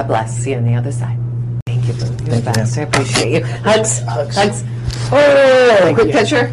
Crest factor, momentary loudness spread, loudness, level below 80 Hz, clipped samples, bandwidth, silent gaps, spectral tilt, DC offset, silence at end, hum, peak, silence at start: 12 dB; 12 LU; -14 LUFS; -38 dBFS; under 0.1%; 12 kHz; 1.62-1.66 s; -5 dB/octave; under 0.1%; 0 s; none; 0 dBFS; 0 s